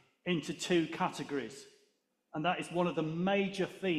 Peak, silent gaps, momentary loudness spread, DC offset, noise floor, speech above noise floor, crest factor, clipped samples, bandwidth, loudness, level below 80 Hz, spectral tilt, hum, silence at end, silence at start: -18 dBFS; none; 8 LU; under 0.1%; -76 dBFS; 42 dB; 18 dB; under 0.1%; 13.5 kHz; -34 LUFS; -74 dBFS; -5.5 dB/octave; none; 0 s; 0.25 s